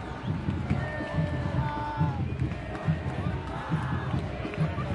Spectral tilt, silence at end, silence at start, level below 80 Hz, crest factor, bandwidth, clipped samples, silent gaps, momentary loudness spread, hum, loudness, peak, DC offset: -8 dB/octave; 0 s; 0 s; -44 dBFS; 16 dB; 10.5 kHz; under 0.1%; none; 3 LU; none; -31 LUFS; -14 dBFS; under 0.1%